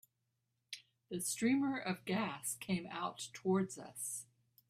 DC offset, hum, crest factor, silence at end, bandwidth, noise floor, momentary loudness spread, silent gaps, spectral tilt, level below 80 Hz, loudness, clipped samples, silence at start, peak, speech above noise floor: under 0.1%; none; 18 dB; 0.45 s; 15.5 kHz; -85 dBFS; 17 LU; none; -4 dB/octave; -78 dBFS; -39 LUFS; under 0.1%; 0.7 s; -22 dBFS; 46 dB